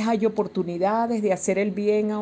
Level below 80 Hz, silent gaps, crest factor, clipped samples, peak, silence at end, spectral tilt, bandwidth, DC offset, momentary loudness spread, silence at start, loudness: -66 dBFS; none; 12 dB; under 0.1%; -10 dBFS; 0 s; -6 dB/octave; 9.8 kHz; under 0.1%; 2 LU; 0 s; -24 LUFS